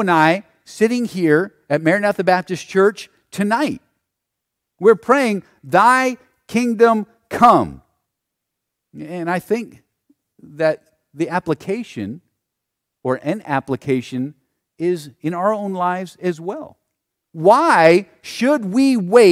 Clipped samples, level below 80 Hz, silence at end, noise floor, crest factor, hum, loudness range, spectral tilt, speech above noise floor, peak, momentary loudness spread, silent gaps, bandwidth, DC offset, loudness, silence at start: under 0.1%; -60 dBFS; 0 s; -80 dBFS; 18 dB; none; 9 LU; -6 dB/octave; 63 dB; 0 dBFS; 17 LU; none; 15.5 kHz; under 0.1%; -17 LUFS; 0 s